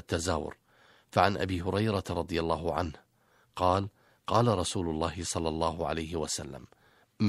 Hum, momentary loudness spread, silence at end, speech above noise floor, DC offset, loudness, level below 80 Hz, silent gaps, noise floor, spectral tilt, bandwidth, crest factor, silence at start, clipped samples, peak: none; 12 LU; 0 s; 37 dB; under 0.1%; -31 LUFS; -50 dBFS; none; -67 dBFS; -5 dB/octave; 14 kHz; 24 dB; 0.1 s; under 0.1%; -6 dBFS